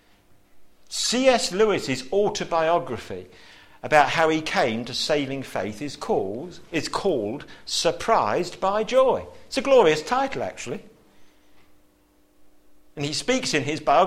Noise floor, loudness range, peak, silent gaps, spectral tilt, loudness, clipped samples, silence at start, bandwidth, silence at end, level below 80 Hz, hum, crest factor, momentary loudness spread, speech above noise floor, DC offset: -60 dBFS; 6 LU; -2 dBFS; none; -3.5 dB/octave; -23 LUFS; under 0.1%; 0.55 s; 15 kHz; 0 s; -52 dBFS; none; 22 dB; 14 LU; 37 dB; under 0.1%